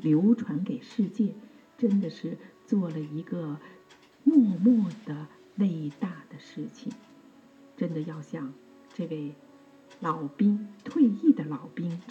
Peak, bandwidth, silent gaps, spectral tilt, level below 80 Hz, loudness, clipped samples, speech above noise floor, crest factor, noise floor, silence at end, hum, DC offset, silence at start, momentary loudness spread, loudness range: -10 dBFS; 7.8 kHz; none; -9 dB/octave; -82 dBFS; -28 LUFS; under 0.1%; 27 dB; 18 dB; -55 dBFS; 0 s; none; under 0.1%; 0 s; 18 LU; 10 LU